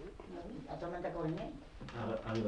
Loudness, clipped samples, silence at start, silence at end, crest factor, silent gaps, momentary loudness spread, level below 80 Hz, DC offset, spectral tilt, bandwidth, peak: -43 LUFS; under 0.1%; 0 s; 0 s; 16 dB; none; 10 LU; -56 dBFS; under 0.1%; -7.5 dB/octave; 10.5 kHz; -26 dBFS